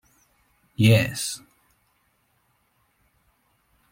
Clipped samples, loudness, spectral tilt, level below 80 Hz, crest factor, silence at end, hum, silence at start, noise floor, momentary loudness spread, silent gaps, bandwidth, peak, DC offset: under 0.1%; -21 LUFS; -5 dB/octave; -58 dBFS; 22 dB; 2.55 s; none; 0.8 s; -68 dBFS; 20 LU; none; 16.5 kHz; -6 dBFS; under 0.1%